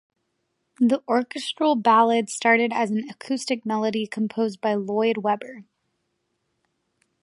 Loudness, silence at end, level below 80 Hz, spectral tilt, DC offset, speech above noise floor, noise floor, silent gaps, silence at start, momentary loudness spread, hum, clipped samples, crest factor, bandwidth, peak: -23 LUFS; 1.6 s; -78 dBFS; -4.5 dB/octave; under 0.1%; 53 dB; -75 dBFS; none; 0.8 s; 11 LU; none; under 0.1%; 18 dB; 11.5 kHz; -6 dBFS